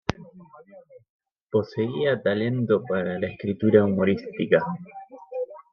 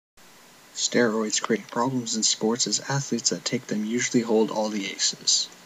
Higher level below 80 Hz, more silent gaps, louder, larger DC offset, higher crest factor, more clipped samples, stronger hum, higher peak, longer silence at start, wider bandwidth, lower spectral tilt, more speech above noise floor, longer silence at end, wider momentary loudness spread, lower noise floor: first, -58 dBFS vs -76 dBFS; first, 1.10-1.19 s, 1.43-1.47 s vs none; about the same, -24 LUFS vs -24 LUFS; neither; about the same, 22 dB vs 20 dB; neither; neither; about the same, -4 dBFS vs -6 dBFS; second, 0.1 s vs 0.75 s; second, 6.6 kHz vs 15.5 kHz; first, -8 dB/octave vs -2.5 dB/octave; about the same, 27 dB vs 26 dB; about the same, 0.1 s vs 0.1 s; first, 16 LU vs 6 LU; about the same, -50 dBFS vs -51 dBFS